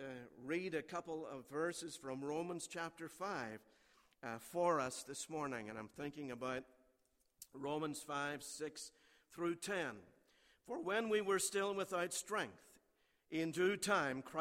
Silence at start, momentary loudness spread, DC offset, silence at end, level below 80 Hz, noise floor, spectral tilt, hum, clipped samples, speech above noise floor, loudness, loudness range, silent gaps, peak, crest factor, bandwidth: 0 s; 13 LU; under 0.1%; 0 s; -80 dBFS; -79 dBFS; -3.5 dB/octave; none; under 0.1%; 37 dB; -42 LUFS; 6 LU; none; -24 dBFS; 20 dB; 16 kHz